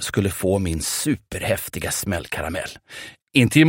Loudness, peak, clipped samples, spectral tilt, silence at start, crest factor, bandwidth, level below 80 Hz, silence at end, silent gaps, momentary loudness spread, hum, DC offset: -23 LUFS; -2 dBFS; under 0.1%; -4.5 dB/octave; 0 s; 20 dB; 16.5 kHz; -42 dBFS; 0 s; 3.22-3.27 s; 12 LU; none; under 0.1%